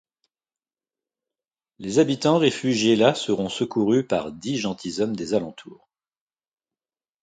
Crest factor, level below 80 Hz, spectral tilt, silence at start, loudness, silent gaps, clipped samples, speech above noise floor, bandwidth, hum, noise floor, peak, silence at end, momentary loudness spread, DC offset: 22 dB; -62 dBFS; -5 dB/octave; 1.8 s; -22 LUFS; none; under 0.1%; over 68 dB; 9.4 kHz; none; under -90 dBFS; -2 dBFS; 1.5 s; 8 LU; under 0.1%